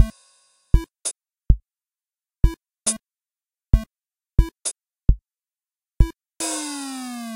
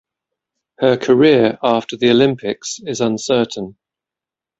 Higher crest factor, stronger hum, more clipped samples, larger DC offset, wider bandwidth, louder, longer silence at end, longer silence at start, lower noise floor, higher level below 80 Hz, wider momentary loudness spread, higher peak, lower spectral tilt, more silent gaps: first, 22 dB vs 16 dB; neither; neither; neither; first, 16 kHz vs 8 kHz; second, -26 LUFS vs -16 LUFS; second, 0 s vs 0.9 s; second, 0 s vs 0.8 s; about the same, under -90 dBFS vs -88 dBFS; first, -26 dBFS vs -56 dBFS; second, 6 LU vs 12 LU; about the same, 0 dBFS vs 0 dBFS; about the same, -4.5 dB/octave vs -5 dB/octave; neither